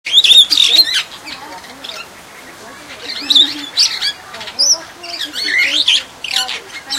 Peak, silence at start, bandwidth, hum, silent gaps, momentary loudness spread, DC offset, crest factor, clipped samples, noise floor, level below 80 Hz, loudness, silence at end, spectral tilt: 0 dBFS; 0.05 s; 17 kHz; none; none; 23 LU; under 0.1%; 16 dB; 0.1%; -36 dBFS; -56 dBFS; -10 LUFS; 0 s; 2 dB/octave